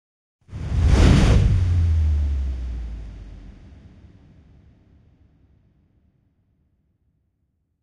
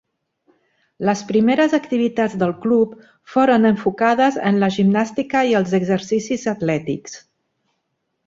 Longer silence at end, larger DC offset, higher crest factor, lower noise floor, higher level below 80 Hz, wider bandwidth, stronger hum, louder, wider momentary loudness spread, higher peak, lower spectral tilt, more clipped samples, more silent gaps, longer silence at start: first, 4.3 s vs 1.1 s; neither; about the same, 20 dB vs 16 dB; about the same, -71 dBFS vs -73 dBFS; first, -26 dBFS vs -58 dBFS; first, 10.5 kHz vs 7.8 kHz; neither; about the same, -20 LUFS vs -18 LUFS; first, 25 LU vs 8 LU; about the same, -2 dBFS vs -2 dBFS; about the same, -7 dB/octave vs -6 dB/octave; neither; neither; second, 0.5 s vs 1 s